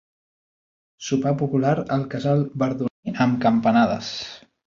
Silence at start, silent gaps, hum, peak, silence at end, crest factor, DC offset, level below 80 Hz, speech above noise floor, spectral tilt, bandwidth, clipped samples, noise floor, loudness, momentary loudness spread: 1 s; 2.91-3.03 s; none; -6 dBFS; 0.3 s; 16 dB; under 0.1%; -58 dBFS; over 69 dB; -6.5 dB/octave; 7.4 kHz; under 0.1%; under -90 dBFS; -22 LUFS; 11 LU